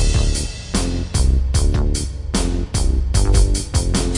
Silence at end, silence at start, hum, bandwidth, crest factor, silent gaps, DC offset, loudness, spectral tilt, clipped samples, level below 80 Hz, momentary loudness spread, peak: 0 s; 0 s; none; 11.5 kHz; 14 dB; none; 0.3%; -20 LUFS; -5 dB/octave; under 0.1%; -18 dBFS; 5 LU; -2 dBFS